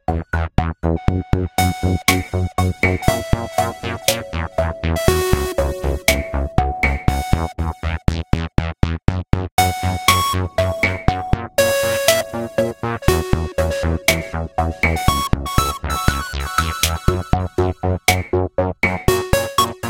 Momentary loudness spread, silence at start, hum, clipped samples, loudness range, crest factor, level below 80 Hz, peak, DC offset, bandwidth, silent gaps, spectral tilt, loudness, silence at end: 6 LU; 0.1 s; none; under 0.1%; 2 LU; 18 dB; -26 dBFS; 0 dBFS; under 0.1%; 17 kHz; 9.52-9.57 s; -4.5 dB/octave; -19 LUFS; 0 s